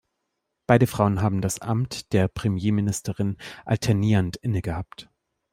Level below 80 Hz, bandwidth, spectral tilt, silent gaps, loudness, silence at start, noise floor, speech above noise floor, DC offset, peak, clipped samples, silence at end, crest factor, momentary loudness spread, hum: -50 dBFS; 16 kHz; -6.5 dB/octave; none; -24 LUFS; 0.7 s; -79 dBFS; 56 dB; under 0.1%; -2 dBFS; under 0.1%; 0.5 s; 22 dB; 12 LU; none